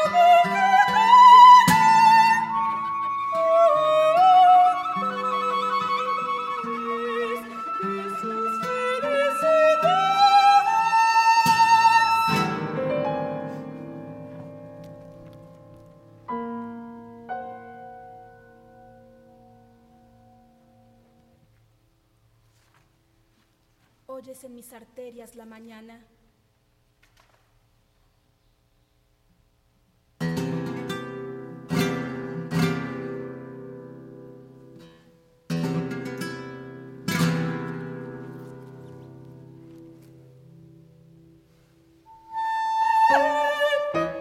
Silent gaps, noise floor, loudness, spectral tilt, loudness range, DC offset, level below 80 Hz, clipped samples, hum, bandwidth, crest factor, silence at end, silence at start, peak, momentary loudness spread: none; -65 dBFS; -20 LUFS; -4.5 dB/octave; 21 LU; under 0.1%; -64 dBFS; under 0.1%; none; 16.5 kHz; 20 dB; 0 s; 0 s; -2 dBFS; 25 LU